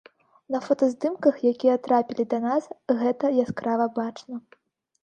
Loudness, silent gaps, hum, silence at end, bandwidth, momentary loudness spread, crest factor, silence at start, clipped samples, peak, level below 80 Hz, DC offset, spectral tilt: -24 LUFS; none; none; 0.65 s; 8.8 kHz; 9 LU; 18 dB; 0.5 s; under 0.1%; -6 dBFS; -70 dBFS; under 0.1%; -7 dB/octave